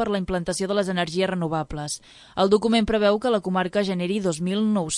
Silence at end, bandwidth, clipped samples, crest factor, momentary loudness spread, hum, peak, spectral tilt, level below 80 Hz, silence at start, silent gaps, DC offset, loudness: 0 s; 11.5 kHz; under 0.1%; 18 dB; 9 LU; none; -6 dBFS; -5 dB/octave; -48 dBFS; 0 s; none; under 0.1%; -23 LUFS